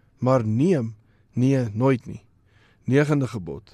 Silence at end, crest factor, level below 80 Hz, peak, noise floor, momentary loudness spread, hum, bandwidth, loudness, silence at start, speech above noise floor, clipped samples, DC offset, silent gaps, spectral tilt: 0.15 s; 18 dB; -58 dBFS; -6 dBFS; -58 dBFS; 14 LU; none; 11 kHz; -22 LUFS; 0.2 s; 37 dB; under 0.1%; under 0.1%; none; -8 dB/octave